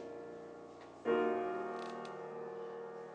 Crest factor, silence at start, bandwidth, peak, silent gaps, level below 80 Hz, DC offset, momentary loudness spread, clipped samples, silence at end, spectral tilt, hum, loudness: 20 dB; 0 s; 9.4 kHz; -22 dBFS; none; -80 dBFS; under 0.1%; 17 LU; under 0.1%; 0 s; -6 dB/octave; none; -41 LUFS